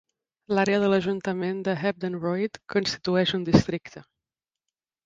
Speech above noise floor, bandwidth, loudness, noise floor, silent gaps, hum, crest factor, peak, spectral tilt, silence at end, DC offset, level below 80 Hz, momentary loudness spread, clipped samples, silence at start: 65 dB; 7.8 kHz; -25 LUFS; -90 dBFS; none; none; 22 dB; -4 dBFS; -6 dB/octave; 1.05 s; under 0.1%; -52 dBFS; 8 LU; under 0.1%; 0.5 s